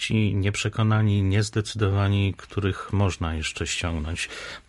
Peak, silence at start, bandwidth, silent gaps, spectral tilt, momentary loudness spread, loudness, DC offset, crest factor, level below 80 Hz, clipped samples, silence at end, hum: -8 dBFS; 0 s; 11.5 kHz; none; -5.5 dB/octave; 7 LU; -25 LUFS; under 0.1%; 16 dB; -40 dBFS; under 0.1%; 0.1 s; none